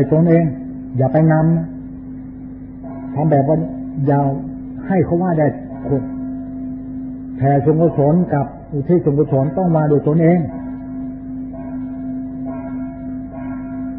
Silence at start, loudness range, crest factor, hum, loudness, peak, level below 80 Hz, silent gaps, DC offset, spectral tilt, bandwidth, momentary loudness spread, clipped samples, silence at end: 0 s; 5 LU; 16 dB; none; -18 LUFS; -2 dBFS; -42 dBFS; none; under 0.1%; -15.5 dB/octave; 2.8 kHz; 15 LU; under 0.1%; 0 s